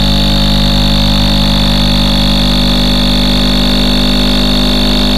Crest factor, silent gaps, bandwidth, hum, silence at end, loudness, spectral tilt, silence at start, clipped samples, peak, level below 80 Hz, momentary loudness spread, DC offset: 8 dB; none; 14.5 kHz; 50 Hz at -10 dBFS; 0 s; -10 LUFS; -5 dB/octave; 0 s; under 0.1%; 0 dBFS; -16 dBFS; 0 LU; 10%